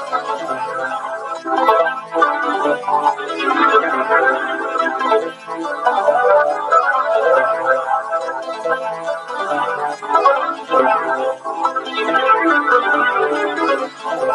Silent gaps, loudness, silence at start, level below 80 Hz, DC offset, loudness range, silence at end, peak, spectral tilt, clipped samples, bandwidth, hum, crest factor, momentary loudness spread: none; -17 LUFS; 0 s; -70 dBFS; under 0.1%; 3 LU; 0 s; 0 dBFS; -3.5 dB/octave; under 0.1%; 12 kHz; none; 16 dB; 9 LU